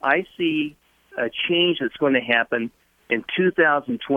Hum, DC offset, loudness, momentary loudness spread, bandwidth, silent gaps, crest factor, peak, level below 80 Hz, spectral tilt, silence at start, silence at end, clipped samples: none; under 0.1%; -21 LUFS; 9 LU; 4 kHz; none; 18 dB; -4 dBFS; -64 dBFS; -7 dB/octave; 0.05 s; 0 s; under 0.1%